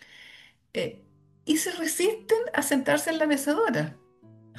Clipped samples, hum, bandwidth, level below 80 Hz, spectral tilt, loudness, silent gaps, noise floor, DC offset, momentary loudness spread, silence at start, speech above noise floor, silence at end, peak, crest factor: under 0.1%; none; 12.5 kHz; -70 dBFS; -3.5 dB/octave; -26 LUFS; none; -54 dBFS; under 0.1%; 12 LU; 0.1 s; 28 dB; 0 s; -10 dBFS; 18 dB